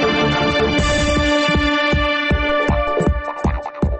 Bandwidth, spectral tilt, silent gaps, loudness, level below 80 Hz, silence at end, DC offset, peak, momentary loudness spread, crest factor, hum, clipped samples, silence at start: 8.8 kHz; -5 dB/octave; none; -17 LUFS; -24 dBFS; 0 s; under 0.1%; -6 dBFS; 6 LU; 12 dB; none; under 0.1%; 0 s